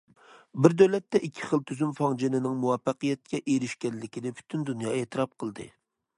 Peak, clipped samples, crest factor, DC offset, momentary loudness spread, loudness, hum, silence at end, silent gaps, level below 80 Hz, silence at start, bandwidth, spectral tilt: -2 dBFS; under 0.1%; 26 dB; under 0.1%; 14 LU; -28 LUFS; none; 0.5 s; none; -70 dBFS; 0.55 s; 11 kHz; -6.5 dB/octave